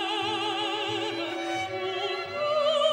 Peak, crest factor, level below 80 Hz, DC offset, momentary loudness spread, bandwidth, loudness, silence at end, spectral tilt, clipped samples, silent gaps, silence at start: -12 dBFS; 16 dB; -72 dBFS; under 0.1%; 6 LU; 16 kHz; -28 LUFS; 0 s; -3 dB/octave; under 0.1%; none; 0 s